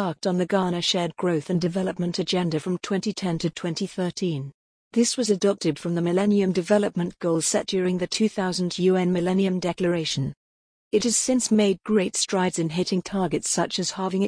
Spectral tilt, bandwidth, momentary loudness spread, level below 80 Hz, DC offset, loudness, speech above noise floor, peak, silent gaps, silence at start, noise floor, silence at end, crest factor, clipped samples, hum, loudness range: -4.5 dB/octave; 10.5 kHz; 6 LU; -60 dBFS; under 0.1%; -24 LUFS; over 66 dB; -6 dBFS; 4.54-4.91 s, 10.37-10.91 s; 0 s; under -90 dBFS; 0 s; 16 dB; under 0.1%; none; 3 LU